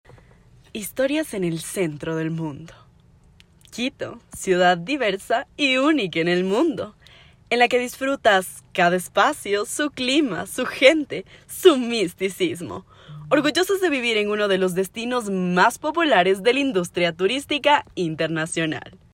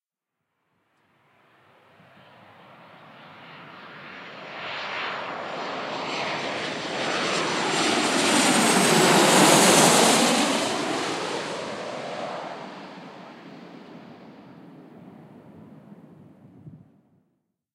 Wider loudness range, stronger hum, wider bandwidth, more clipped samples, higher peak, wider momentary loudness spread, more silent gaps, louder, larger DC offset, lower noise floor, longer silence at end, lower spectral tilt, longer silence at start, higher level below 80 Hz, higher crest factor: second, 7 LU vs 21 LU; neither; about the same, 16 kHz vs 16 kHz; neither; first, 0 dBFS vs -4 dBFS; second, 13 LU vs 27 LU; neither; about the same, -21 LUFS vs -21 LUFS; neither; second, -53 dBFS vs -84 dBFS; second, 0.2 s vs 1 s; first, -4 dB/octave vs -2.5 dB/octave; second, 0.75 s vs 3.2 s; first, -58 dBFS vs -74 dBFS; about the same, 22 dB vs 22 dB